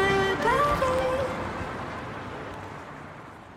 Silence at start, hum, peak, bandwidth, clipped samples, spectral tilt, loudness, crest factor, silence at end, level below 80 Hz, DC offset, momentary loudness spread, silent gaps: 0 s; none; -12 dBFS; 16.5 kHz; under 0.1%; -5 dB/octave; -27 LUFS; 16 dB; 0 s; -46 dBFS; under 0.1%; 18 LU; none